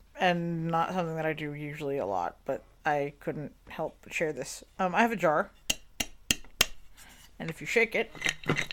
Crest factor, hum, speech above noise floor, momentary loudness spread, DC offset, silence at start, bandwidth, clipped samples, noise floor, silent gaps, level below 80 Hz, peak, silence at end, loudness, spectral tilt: 26 dB; none; 22 dB; 12 LU; under 0.1%; 0.15 s; 18 kHz; under 0.1%; -52 dBFS; none; -56 dBFS; -4 dBFS; 0 s; -31 LUFS; -3.5 dB/octave